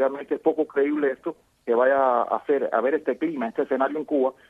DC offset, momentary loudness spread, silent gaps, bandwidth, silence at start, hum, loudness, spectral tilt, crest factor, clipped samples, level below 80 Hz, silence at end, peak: under 0.1%; 6 LU; none; 4.5 kHz; 0 s; none; -24 LUFS; -7.5 dB/octave; 16 dB; under 0.1%; -70 dBFS; 0.15 s; -8 dBFS